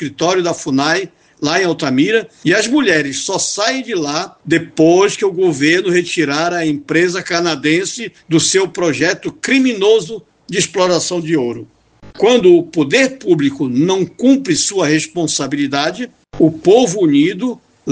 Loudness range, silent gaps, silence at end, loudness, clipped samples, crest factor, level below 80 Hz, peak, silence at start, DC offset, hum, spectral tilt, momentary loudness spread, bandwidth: 2 LU; none; 0 s; -14 LUFS; under 0.1%; 14 dB; -56 dBFS; 0 dBFS; 0 s; under 0.1%; none; -4 dB/octave; 8 LU; 9.8 kHz